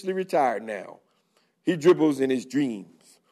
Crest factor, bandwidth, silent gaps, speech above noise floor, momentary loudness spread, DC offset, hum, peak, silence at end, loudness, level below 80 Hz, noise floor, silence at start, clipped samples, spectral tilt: 20 dB; 13 kHz; none; 44 dB; 16 LU; under 0.1%; none; -6 dBFS; 0.45 s; -24 LUFS; -78 dBFS; -68 dBFS; 0.05 s; under 0.1%; -6 dB/octave